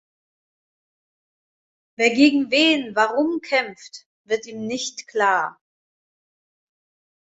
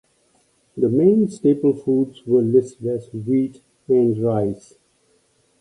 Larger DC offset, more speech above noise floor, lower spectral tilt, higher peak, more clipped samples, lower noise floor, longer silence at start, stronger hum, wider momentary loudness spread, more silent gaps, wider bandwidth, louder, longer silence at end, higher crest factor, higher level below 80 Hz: neither; first, over 70 dB vs 43 dB; second, -2.5 dB/octave vs -9.5 dB/octave; about the same, -4 dBFS vs -4 dBFS; neither; first, under -90 dBFS vs -62 dBFS; first, 2 s vs 0.75 s; neither; first, 14 LU vs 10 LU; first, 4.06-4.25 s vs none; second, 8 kHz vs 10.5 kHz; about the same, -20 LUFS vs -19 LUFS; first, 1.75 s vs 1.05 s; about the same, 20 dB vs 16 dB; second, -70 dBFS vs -60 dBFS